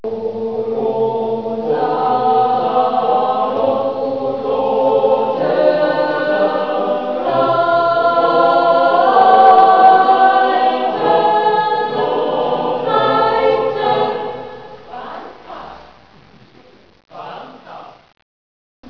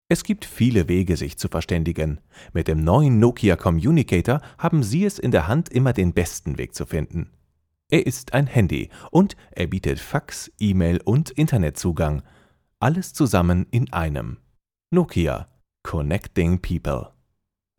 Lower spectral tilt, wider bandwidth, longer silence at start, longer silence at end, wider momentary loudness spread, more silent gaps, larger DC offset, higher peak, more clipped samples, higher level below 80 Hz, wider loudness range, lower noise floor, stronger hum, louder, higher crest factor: about the same, -7 dB/octave vs -7 dB/octave; second, 5.4 kHz vs 18 kHz; about the same, 0.05 s vs 0.1 s; first, 1 s vs 0.75 s; first, 21 LU vs 10 LU; neither; first, 0.6% vs under 0.1%; first, 0 dBFS vs -4 dBFS; neither; second, -56 dBFS vs -38 dBFS; first, 11 LU vs 4 LU; second, -46 dBFS vs -76 dBFS; neither; first, -14 LUFS vs -22 LUFS; about the same, 14 dB vs 18 dB